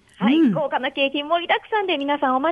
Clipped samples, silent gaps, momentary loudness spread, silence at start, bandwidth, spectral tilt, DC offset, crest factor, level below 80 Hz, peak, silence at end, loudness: under 0.1%; none; 5 LU; 0.2 s; 5 kHz; -7 dB/octave; under 0.1%; 14 dB; -66 dBFS; -6 dBFS; 0 s; -21 LUFS